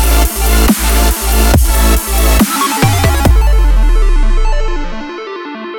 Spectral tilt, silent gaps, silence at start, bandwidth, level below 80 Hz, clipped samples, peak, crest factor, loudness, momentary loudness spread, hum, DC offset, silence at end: -4.5 dB/octave; none; 0 s; 19.5 kHz; -10 dBFS; under 0.1%; 0 dBFS; 10 dB; -12 LUFS; 12 LU; none; under 0.1%; 0 s